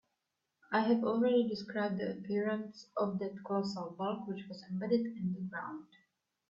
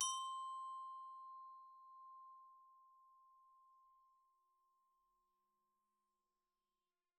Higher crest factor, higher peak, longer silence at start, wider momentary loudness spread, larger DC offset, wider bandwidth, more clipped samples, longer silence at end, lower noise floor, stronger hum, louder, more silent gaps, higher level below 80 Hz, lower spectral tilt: second, 18 dB vs 26 dB; first, -18 dBFS vs -28 dBFS; first, 0.7 s vs 0 s; second, 12 LU vs 23 LU; neither; second, 7.6 kHz vs 10 kHz; neither; second, 0.65 s vs 3.1 s; second, -86 dBFS vs under -90 dBFS; neither; first, -35 LUFS vs -51 LUFS; neither; first, -78 dBFS vs under -90 dBFS; first, -7.5 dB/octave vs 4.5 dB/octave